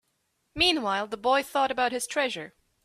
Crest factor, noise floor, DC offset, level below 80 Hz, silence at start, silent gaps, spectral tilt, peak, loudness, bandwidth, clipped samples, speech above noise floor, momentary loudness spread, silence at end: 18 dB; -75 dBFS; under 0.1%; -58 dBFS; 0.55 s; none; -2 dB/octave; -10 dBFS; -26 LUFS; 15.5 kHz; under 0.1%; 48 dB; 13 LU; 0.35 s